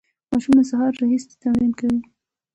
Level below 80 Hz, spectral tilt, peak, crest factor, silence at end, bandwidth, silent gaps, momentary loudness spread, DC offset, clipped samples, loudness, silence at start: -52 dBFS; -6.5 dB/octave; -6 dBFS; 14 dB; 0.55 s; 8.2 kHz; none; 8 LU; under 0.1%; under 0.1%; -20 LUFS; 0.3 s